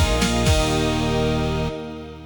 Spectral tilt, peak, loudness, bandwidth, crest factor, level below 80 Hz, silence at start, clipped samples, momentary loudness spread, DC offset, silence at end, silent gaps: -5 dB/octave; -6 dBFS; -21 LUFS; 19 kHz; 16 dB; -28 dBFS; 0 s; under 0.1%; 10 LU; under 0.1%; 0 s; none